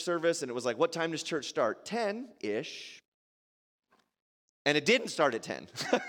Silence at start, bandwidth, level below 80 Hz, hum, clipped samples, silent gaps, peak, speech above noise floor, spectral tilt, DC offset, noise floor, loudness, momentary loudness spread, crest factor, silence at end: 0 s; 17 kHz; -82 dBFS; none; under 0.1%; 3.08-3.79 s, 4.22-4.65 s; -10 dBFS; over 58 dB; -3.5 dB/octave; under 0.1%; under -90 dBFS; -31 LUFS; 12 LU; 22 dB; 0 s